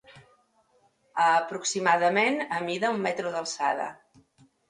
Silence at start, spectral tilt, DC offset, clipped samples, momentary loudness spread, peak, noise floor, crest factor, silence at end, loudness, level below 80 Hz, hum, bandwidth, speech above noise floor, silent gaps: 0.1 s; -3 dB/octave; under 0.1%; under 0.1%; 9 LU; -8 dBFS; -66 dBFS; 20 dB; 0.75 s; -26 LUFS; -76 dBFS; none; 11 kHz; 40 dB; none